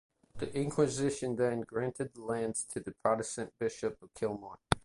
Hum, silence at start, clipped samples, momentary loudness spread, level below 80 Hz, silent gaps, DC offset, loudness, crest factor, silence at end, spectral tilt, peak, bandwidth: none; 0.35 s; under 0.1%; 8 LU; -58 dBFS; none; under 0.1%; -35 LUFS; 30 dB; 0.05 s; -5 dB/octave; -6 dBFS; 11.5 kHz